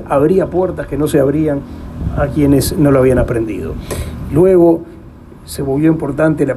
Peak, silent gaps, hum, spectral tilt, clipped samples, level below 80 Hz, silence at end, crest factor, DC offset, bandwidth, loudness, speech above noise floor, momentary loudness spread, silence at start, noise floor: 0 dBFS; none; none; -7 dB/octave; under 0.1%; -30 dBFS; 0 s; 12 dB; under 0.1%; 15 kHz; -14 LUFS; 22 dB; 13 LU; 0 s; -35 dBFS